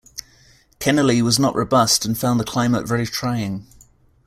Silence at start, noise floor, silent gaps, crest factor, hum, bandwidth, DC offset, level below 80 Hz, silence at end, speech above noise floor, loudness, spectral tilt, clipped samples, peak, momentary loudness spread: 0.15 s; -53 dBFS; none; 18 dB; none; 16 kHz; under 0.1%; -50 dBFS; 0.65 s; 34 dB; -19 LUFS; -4.5 dB/octave; under 0.1%; -2 dBFS; 12 LU